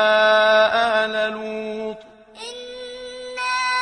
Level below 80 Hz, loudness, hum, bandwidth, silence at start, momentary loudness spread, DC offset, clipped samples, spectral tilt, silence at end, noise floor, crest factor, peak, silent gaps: -62 dBFS; -19 LUFS; none; 10.5 kHz; 0 s; 19 LU; under 0.1%; under 0.1%; -2 dB/octave; 0 s; -41 dBFS; 16 dB; -4 dBFS; none